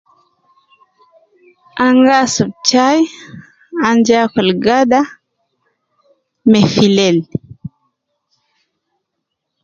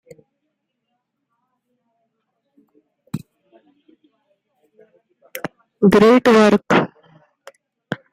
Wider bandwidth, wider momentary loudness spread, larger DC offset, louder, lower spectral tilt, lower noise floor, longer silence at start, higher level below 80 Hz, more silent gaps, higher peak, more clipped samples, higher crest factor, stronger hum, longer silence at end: second, 7.8 kHz vs 16 kHz; second, 16 LU vs 22 LU; neither; about the same, -12 LUFS vs -14 LUFS; second, -4.5 dB/octave vs -6.5 dB/octave; about the same, -75 dBFS vs -75 dBFS; second, 1.75 s vs 3.15 s; about the same, -54 dBFS vs -54 dBFS; neither; about the same, 0 dBFS vs 0 dBFS; neither; about the same, 16 dB vs 20 dB; neither; first, 1.95 s vs 0.15 s